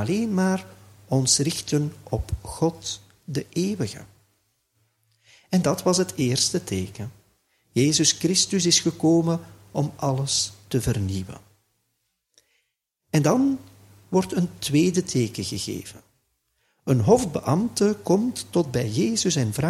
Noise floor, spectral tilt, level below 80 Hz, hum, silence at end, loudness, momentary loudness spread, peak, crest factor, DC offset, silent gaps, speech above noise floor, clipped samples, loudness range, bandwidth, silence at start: -76 dBFS; -4.5 dB/octave; -50 dBFS; none; 0 s; -23 LUFS; 13 LU; -4 dBFS; 20 dB; under 0.1%; none; 54 dB; under 0.1%; 7 LU; 15.5 kHz; 0 s